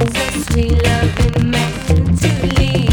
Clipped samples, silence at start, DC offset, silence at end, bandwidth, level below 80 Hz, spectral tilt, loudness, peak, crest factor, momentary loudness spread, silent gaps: under 0.1%; 0 s; under 0.1%; 0 s; 19.5 kHz; -20 dBFS; -5.5 dB/octave; -15 LUFS; -2 dBFS; 12 dB; 3 LU; none